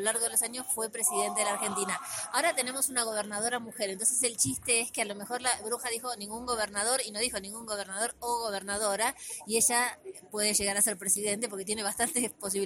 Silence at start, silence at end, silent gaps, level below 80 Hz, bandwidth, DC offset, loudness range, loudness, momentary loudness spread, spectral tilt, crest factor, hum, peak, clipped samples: 0 s; 0 s; none; -64 dBFS; 16.5 kHz; under 0.1%; 3 LU; -29 LUFS; 8 LU; -1 dB/octave; 20 dB; none; -12 dBFS; under 0.1%